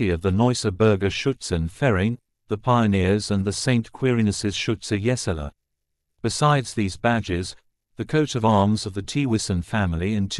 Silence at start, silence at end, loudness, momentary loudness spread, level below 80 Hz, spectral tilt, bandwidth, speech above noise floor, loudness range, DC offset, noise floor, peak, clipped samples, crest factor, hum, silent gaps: 0 s; 0 s; -23 LUFS; 8 LU; -44 dBFS; -5.5 dB/octave; 12 kHz; 56 dB; 3 LU; under 0.1%; -78 dBFS; -6 dBFS; under 0.1%; 18 dB; none; none